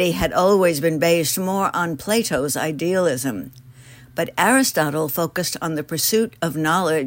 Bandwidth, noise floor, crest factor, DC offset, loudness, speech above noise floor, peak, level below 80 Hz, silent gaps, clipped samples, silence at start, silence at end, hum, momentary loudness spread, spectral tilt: 16.5 kHz; -44 dBFS; 18 dB; under 0.1%; -20 LUFS; 24 dB; -2 dBFS; -48 dBFS; none; under 0.1%; 0 s; 0 s; none; 9 LU; -4 dB/octave